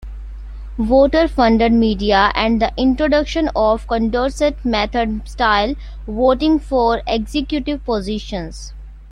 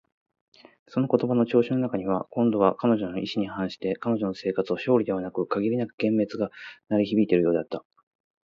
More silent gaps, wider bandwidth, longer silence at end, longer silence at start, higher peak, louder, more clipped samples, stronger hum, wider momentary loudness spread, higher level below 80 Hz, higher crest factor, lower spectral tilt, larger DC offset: second, none vs 5.94-5.98 s; first, 11 kHz vs 7 kHz; second, 0 s vs 0.65 s; second, 0 s vs 0.9 s; first, -2 dBFS vs -6 dBFS; first, -17 LUFS vs -25 LUFS; neither; neither; first, 14 LU vs 8 LU; first, -30 dBFS vs -62 dBFS; about the same, 16 dB vs 20 dB; second, -5.5 dB/octave vs -8.5 dB/octave; neither